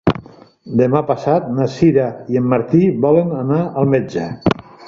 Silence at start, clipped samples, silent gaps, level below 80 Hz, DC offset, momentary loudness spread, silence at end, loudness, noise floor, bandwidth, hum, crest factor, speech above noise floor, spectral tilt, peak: 0.05 s; under 0.1%; none; -46 dBFS; under 0.1%; 6 LU; 0 s; -16 LUFS; -39 dBFS; 7.4 kHz; none; 14 dB; 24 dB; -8.5 dB/octave; -2 dBFS